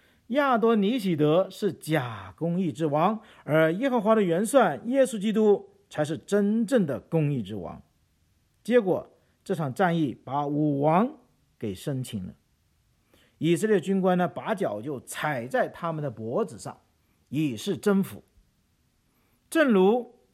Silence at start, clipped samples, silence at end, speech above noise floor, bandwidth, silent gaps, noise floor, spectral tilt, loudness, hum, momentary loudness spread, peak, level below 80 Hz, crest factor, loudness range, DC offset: 0.3 s; under 0.1%; 0.25 s; 43 dB; 15.5 kHz; none; -68 dBFS; -6.5 dB/octave; -26 LUFS; none; 12 LU; -8 dBFS; -68 dBFS; 18 dB; 6 LU; under 0.1%